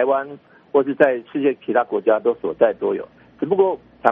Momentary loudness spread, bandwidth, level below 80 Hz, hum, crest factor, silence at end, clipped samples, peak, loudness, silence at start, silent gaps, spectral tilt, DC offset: 8 LU; 3.8 kHz; -64 dBFS; none; 20 dB; 0 s; under 0.1%; 0 dBFS; -20 LUFS; 0 s; none; -4.5 dB/octave; under 0.1%